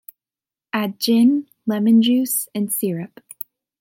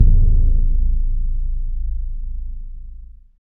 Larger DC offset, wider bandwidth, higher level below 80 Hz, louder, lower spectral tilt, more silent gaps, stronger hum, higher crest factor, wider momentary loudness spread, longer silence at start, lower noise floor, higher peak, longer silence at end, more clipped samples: second, under 0.1% vs 0.4%; first, 17 kHz vs 0.6 kHz; second, -74 dBFS vs -16 dBFS; first, -19 LUFS vs -23 LUFS; second, -4.5 dB/octave vs -14.5 dB/octave; neither; neither; about the same, 14 dB vs 16 dB; about the same, 19 LU vs 20 LU; first, 0.75 s vs 0 s; first, under -90 dBFS vs -36 dBFS; second, -6 dBFS vs 0 dBFS; first, 0.75 s vs 0.3 s; neither